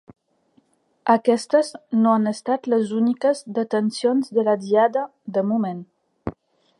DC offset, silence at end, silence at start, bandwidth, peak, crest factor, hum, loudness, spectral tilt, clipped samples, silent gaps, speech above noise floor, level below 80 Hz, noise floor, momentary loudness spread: under 0.1%; 0.5 s; 1.05 s; 11.5 kHz; -4 dBFS; 18 dB; none; -21 LUFS; -6 dB/octave; under 0.1%; none; 42 dB; -60 dBFS; -63 dBFS; 10 LU